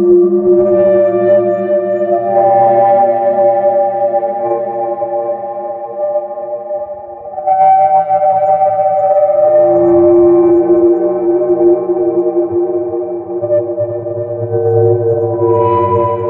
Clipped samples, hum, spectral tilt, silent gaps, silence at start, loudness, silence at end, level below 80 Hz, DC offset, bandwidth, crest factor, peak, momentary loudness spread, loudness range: under 0.1%; none; -12 dB/octave; none; 0 s; -12 LUFS; 0 s; -52 dBFS; under 0.1%; 3.1 kHz; 10 dB; 0 dBFS; 11 LU; 6 LU